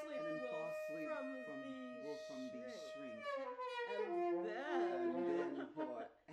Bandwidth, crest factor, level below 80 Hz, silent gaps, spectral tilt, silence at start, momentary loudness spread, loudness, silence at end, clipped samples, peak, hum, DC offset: 9.8 kHz; 14 dB; -88 dBFS; none; -5.5 dB/octave; 0 s; 9 LU; -44 LUFS; 0 s; under 0.1%; -30 dBFS; none; under 0.1%